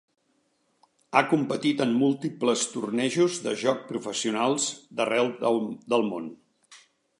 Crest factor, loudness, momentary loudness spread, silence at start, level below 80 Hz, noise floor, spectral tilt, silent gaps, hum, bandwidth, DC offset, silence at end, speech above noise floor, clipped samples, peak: 24 dB; -26 LUFS; 6 LU; 1.1 s; -78 dBFS; -71 dBFS; -4 dB/octave; none; none; 11.5 kHz; under 0.1%; 0.45 s; 45 dB; under 0.1%; -4 dBFS